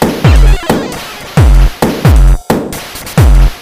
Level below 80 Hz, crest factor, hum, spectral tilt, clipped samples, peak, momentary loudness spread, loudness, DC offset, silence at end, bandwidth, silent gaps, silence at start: -10 dBFS; 8 dB; none; -6 dB/octave; 3%; 0 dBFS; 11 LU; -10 LUFS; under 0.1%; 0 s; 16 kHz; none; 0 s